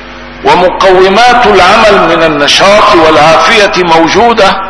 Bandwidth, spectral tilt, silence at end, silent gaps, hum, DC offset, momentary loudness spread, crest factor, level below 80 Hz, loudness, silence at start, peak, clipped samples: 11 kHz; -3.5 dB/octave; 0 s; none; none; under 0.1%; 3 LU; 4 dB; -30 dBFS; -4 LUFS; 0 s; 0 dBFS; 10%